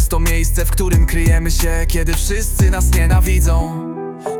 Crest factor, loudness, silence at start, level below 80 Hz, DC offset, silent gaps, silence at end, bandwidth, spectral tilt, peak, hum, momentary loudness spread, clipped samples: 10 dB; -16 LUFS; 0 s; -16 dBFS; under 0.1%; none; 0 s; 18 kHz; -5 dB/octave; -4 dBFS; none; 5 LU; under 0.1%